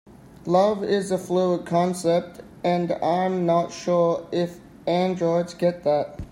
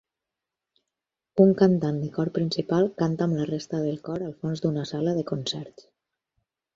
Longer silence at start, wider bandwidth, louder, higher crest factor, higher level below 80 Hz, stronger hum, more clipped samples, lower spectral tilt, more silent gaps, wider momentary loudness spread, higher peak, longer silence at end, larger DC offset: second, 0.45 s vs 1.35 s; first, 15 kHz vs 7.8 kHz; about the same, -23 LUFS vs -25 LUFS; about the same, 18 dB vs 22 dB; first, -54 dBFS vs -64 dBFS; neither; neither; about the same, -6.5 dB/octave vs -7.5 dB/octave; neither; second, 6 LU vs 11 LU; about the same, -6 dBFS vs -4 dBFS; second, 0.05 s vs 1.05 s; neither